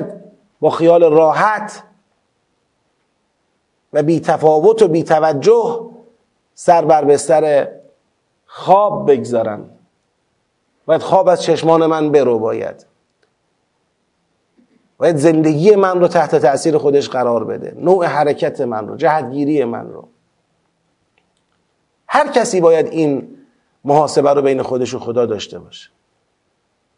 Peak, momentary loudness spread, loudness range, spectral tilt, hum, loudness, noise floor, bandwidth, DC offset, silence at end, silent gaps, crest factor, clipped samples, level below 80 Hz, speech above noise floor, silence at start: 0 dBFS; 13 LU; 6 LU; -6 dB/octave; none; -14 LUFS; -66 dBFS; 11 kHz; under 0.1%; 1.2 s; none; 16 dB; under 0.1%; -66 dBFS; 52 dB; 0 s